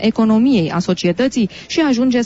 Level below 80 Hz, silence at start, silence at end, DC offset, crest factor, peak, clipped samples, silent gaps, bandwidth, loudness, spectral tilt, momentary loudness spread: -48 dBFS; 0 s; 0 s; under 0.1%; 10 dB; -4 dBFS; under 0.1%; none; 8 kHz; -16 LUFS; -6 dB/octave; 5 LU